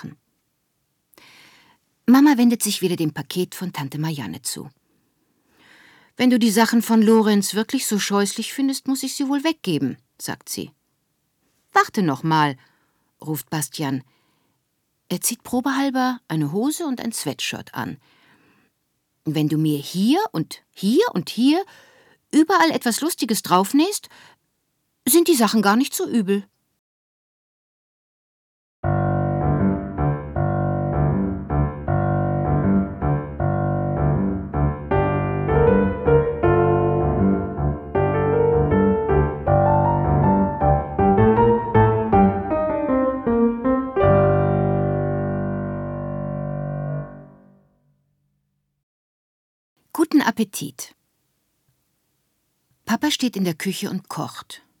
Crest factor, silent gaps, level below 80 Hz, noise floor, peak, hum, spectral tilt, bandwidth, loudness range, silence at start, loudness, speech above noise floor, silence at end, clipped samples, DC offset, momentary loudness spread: 20 dB; 26.79-28.83 s, 48.83-49.76 s; -38 dBFS; -72 dBFS; -2 dBFS; none; -5.5 dB/octave; 19.5 kHz; 9 LU; 0 s; -20 LUFS; 52 dB; 0.25 s; under 0.1%; under 0.1%; 12 LU